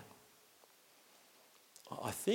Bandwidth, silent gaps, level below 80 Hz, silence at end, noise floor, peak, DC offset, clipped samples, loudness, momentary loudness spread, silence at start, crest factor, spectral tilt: 17 kHz; none; -82 dBFS; 0 s; -66 dBFS; -22 dBFS; under 0.1%; under 0.1%; -45 LUFS; 21 LU; 0 s; 22 dB; -4 dB/octave